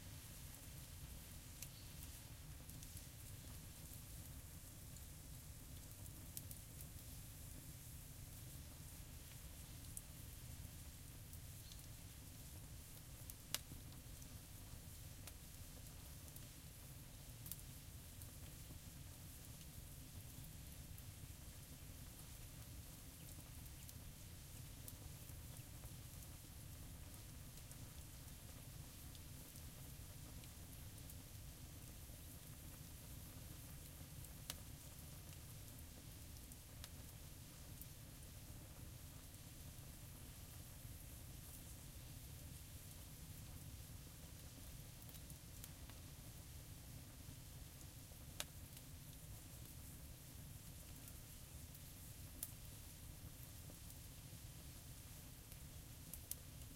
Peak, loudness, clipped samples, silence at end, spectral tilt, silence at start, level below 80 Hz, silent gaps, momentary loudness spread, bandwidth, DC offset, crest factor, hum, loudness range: -16 dBFS; -56 LUFS; under 0.1%; 0 s; -3.5 dB/octave; 0 s; -62 dBFS; none; 3 LU; 16.5 kHz; under 0.1%; 40 dB; none; 3 LU